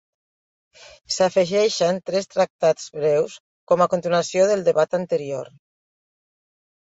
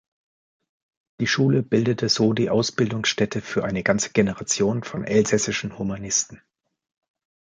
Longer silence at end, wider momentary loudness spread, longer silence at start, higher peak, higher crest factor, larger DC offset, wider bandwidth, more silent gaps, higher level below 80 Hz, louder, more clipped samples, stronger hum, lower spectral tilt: first, 1.4 s vs 1.2 s; about the same, 8 LU vs 7 LU; about the same, 1.1 s vs 1.2 s; about the same, -4 dBFS vs -4 dBFS; about the same, 18 dB vs 20 dB; neither; second, 8 kHz vs 9.6 kHz; first, 2.50-2.59 s, 3.40-3.67 s vs none; second, -66 dBFS vs -54 dBFS; about the same, -21 LUFS vs -22 LUFS; neither; neither; about the same, -4.5 dB/octave vs -4 dB/octave